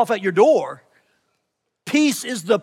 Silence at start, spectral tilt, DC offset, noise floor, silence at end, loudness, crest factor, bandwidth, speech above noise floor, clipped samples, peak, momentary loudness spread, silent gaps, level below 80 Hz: 0 s; -4 dB/octave; under 0.1%; -75 dBFS; 0 s; -18 LUFS; 16 dB; 16.5 kHz; 57 dB; under 0.1%; -4 dBFS; 20 LU; none; -82 dBFS